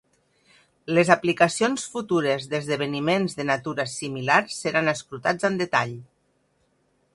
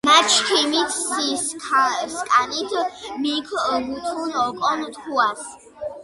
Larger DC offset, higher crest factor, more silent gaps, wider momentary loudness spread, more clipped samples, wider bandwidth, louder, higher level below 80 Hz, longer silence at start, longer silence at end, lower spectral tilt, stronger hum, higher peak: neither; about the same, 24 dB vs 20 dB; neither; about the same, 9 LU vs 11 LU; neither; about the same, 11.5 kHz vs 11.5 kHz; second, -23 LUFS vs -20 LUFS; about the same, -66 dBFS vs -62 dBFS; first, 0.85 s vs 0.05 s; first, 1.1 s vs 0 s; first, -4.5 dB/octave vs -0.5 dB/octave; neither; about the same, 0 dBFS vs -2 dBFS